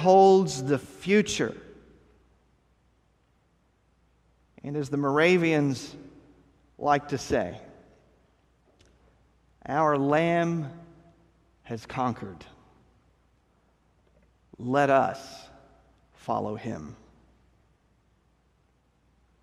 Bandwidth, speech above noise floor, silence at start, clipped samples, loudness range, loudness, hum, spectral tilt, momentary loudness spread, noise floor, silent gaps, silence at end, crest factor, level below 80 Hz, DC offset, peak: 12.5 kHz; 42 dB; 0 s; under 0.1%; 12 LU; -26 LUFS; none; -5.5 dB/octave; 22 LU; -67 dBFS; none; 2.5 s; 22 dB; -60 dBFS; under 0.1%; -8 dBFS